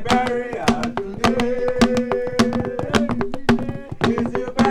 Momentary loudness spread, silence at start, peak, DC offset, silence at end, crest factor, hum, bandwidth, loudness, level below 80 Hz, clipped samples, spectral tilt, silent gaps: 5 LU; 0 s; 0 dBFS; under 0.1%; 0 s; 20 dB; none; 14 kHz; -21 LUFS; -40 dBFS; under 0.1%; -5.5 dB/octave; none